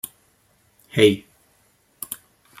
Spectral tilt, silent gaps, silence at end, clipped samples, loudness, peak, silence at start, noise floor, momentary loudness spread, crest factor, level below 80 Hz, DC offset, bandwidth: -4.5 dB/octave; none; 0.45 s; under 0.1%; -21 LUFS; -2 dBFS; 0.95 s; -62 dBFS; 19 LU; 22 dB; -62 dBFS; under 0.1%; 16 kHz